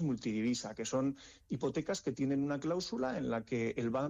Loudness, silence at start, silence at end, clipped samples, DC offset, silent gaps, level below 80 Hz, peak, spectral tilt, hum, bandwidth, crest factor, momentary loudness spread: -36 LUFS; 0 s; 0 s; under 0.1%; under 0.1%; none; -66 dBFS; -26 dBFS; -5.5 dB/octave; none; 9.8 kHz; 10 dB; 4 LU